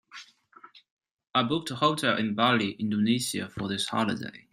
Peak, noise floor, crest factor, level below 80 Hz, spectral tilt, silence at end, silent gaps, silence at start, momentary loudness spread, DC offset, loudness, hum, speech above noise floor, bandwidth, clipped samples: -8 dBFS; -55 dBFS; 20 dB; -68 dBFS; -4.5 dB/octave; 0.15 s; 0.90-0.97 s; 0.15 s; 9 LU; under 0.1%; -27 LUFS; none; 28 dB; 15.5 kHz; under 0.1%